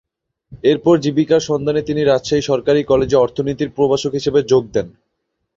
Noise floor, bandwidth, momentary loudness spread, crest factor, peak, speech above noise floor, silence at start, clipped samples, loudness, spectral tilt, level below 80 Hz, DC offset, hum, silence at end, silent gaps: -73 dBFS; 7.8 kHz; 6 LU; 14 dB; -2 dBFS; 57 dB; 0.5 s; under 0.1%; -16 LUFS; -6 dB/octave; -46 dBFS; under 0.1%; none; 0.65 s; none